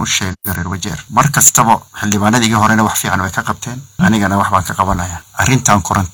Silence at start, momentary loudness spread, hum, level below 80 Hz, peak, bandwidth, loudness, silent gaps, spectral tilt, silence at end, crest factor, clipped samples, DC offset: 0 s; 12 LU; none; -36 dBFS; 0 dBFS; over 20 kHz; -13 LUFS; none; -3.5 dB/octave; 0.05 s; 14 dB; 0.2%; under 0.1%